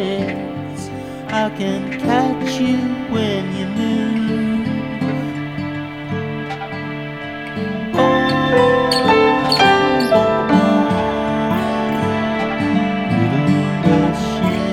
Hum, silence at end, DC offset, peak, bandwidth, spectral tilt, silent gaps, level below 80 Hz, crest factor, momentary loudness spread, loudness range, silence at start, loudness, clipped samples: none; 0 s; under 0.1%; 0 dBFS; 15 kHz; -6 dB/octave; none; -44 dBFS; 16 dB; 12 LU; 8 LU; 0 s; -17 LUFS; under 0.1%